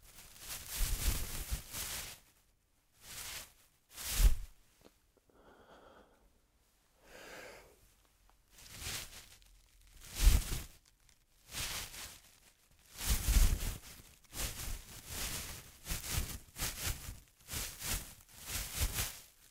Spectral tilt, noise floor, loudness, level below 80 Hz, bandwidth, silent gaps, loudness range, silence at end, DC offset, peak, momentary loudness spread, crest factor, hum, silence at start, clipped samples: -2.5 dB/octave; -73 dBFS; -39 LUFS; -40 dBFS; 16 kHz; none; 13 LU; 0.25 s; under 0.1%; -14 dBFS; 22 LU; 26 dB; none; 0.05 s; under 0.1%